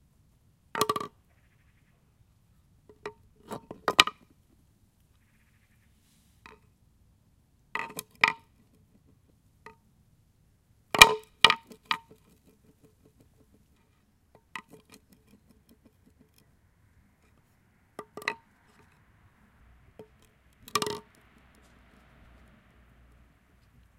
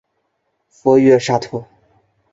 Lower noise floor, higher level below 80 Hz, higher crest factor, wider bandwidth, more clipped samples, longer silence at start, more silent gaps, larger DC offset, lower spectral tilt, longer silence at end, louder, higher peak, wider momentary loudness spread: about the same, -67 dBFS vs -69 dBFS; about the same, -60 dBFS vs -58 dBFS; first, 34 dB vs 16 dB; first, 16.5 kHz vs 7.8 kHz; neither; about the same, 0.75 s vs 0.85 s; neither; neither; second, -0.5 dB/octave vs -6 dB/octave; first, 3 s vs 0.7 s; second, -25 LUFS vs -14 LUFS; about the same, 0 dBFS vs -2 dBFS; first, 28 LU vs 17 LU